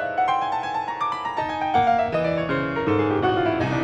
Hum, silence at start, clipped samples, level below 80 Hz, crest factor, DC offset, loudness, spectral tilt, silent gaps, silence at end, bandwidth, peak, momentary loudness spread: none; 0 s; under 0.1%; -50 dBFS; 14 dB; under 0.1%; -23 LUFS; -7 dB/octave; none; 0 s; 8.8 kHz; -8 dBFS; 6 LU